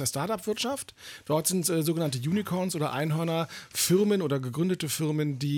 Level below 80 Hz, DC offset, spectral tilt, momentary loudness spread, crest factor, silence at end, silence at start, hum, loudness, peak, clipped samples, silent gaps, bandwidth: -68 dBFS; under 0.1%; -5 dB/octave; 7 LU; 16 dB; 0 s; 0 s; none; -28 LUFS; -12 dBFS; under 0.1%; none; 19 kHz